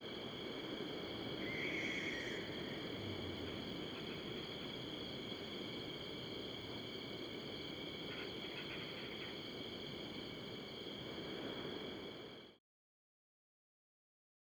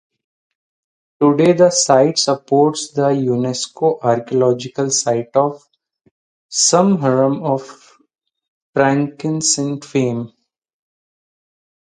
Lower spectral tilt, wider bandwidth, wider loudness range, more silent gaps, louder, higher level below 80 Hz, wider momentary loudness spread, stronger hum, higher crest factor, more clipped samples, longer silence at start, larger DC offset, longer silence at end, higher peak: about the same, -4.5 dB/octave vs -4 dB/octave; first, over 20 kHz vs 10.5 kHz; about the same, 6 LU vs 5 LU; second, none vs 6.11-6.49 s, 8.48-8.73 s; second, -45 LUFS vs -16 LUFS; second, -70 dBFS vs -64 dBFS; second, 6 LU vs 9 LU; neither; about the same, 18 dB vs 18 dB; neither; second, 0 s vs 1.2 s; neither; first, 2 s vs 1.7 s; second, -30 dBFS vs 0 dBFS